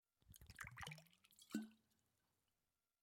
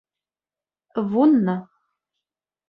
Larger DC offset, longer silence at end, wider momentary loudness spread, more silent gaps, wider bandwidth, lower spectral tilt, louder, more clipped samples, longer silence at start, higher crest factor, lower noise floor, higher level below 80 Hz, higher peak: neither; first, 1.25 s vs 1.05 s; first, 16 LU vs 13 LU; neither; first, 16.5 kHz vs 4.9 kHz; second, -4 dB/octave vs -11 dB/octave; second, -55 LUFS vs -20 LUFS; neither; second, 0.25 s vs 0.95 s; first, 26 dB vs 18 dB; about the same, under -90 dBFS vs under -90 dBFS; second, -76 dBFS vs -70 dBFS; second, -32 dBFS vs -6 dBFS